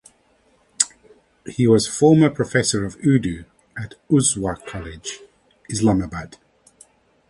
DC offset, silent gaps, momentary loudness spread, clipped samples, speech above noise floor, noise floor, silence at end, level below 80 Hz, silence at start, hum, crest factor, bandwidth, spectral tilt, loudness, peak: under 0.1%; none; 19 LU; under 0.1%; 40 dB; -60 dBFS; 1 s; -46 dBFS; 0.8 s; none; 22 dB; 11.5 kHz; -5 dB/octave; -19 LUFS; 0 dBFS